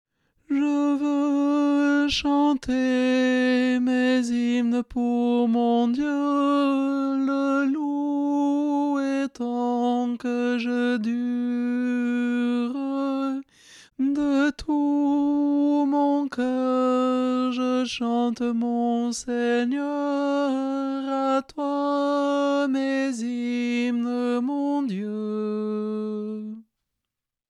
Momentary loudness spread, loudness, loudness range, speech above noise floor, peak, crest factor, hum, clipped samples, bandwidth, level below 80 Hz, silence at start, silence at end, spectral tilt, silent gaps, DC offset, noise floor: 6 LU; -24 LUFS; 4 LU; 63 dB; -12 dBFS; 12 dB; none; under 0.1%; 10.5 kHz; -56 dBFS; 0.5 s; 0.9 s; -5 dB/octave; none; under 0.1%; -86 dBFS